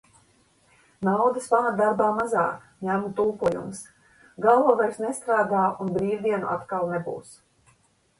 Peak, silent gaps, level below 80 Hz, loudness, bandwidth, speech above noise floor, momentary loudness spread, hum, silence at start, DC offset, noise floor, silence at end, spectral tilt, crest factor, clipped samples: -6 dBFS; none; -62 dBFS; -24 LUFS; 11.5 kHz; 40 dB; 10 LU; none; 1 s; under 0.1%; -63 dBFS; 0.85 s; -6.5 dB/octave; 20 dB; under 0.1%